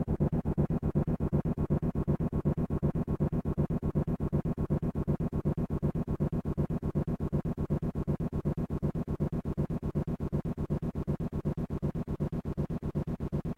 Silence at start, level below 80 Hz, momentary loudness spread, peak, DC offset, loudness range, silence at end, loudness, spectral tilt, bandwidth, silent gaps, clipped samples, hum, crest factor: 0 s; -40 dBFS; 4 LU; -18 dBFS; under 0.1%; 3 LU; 0.05 s; -33 LUFS; -10.5 dB/octave; 4.4 kHz; none; under 0.1%; none; 14 dB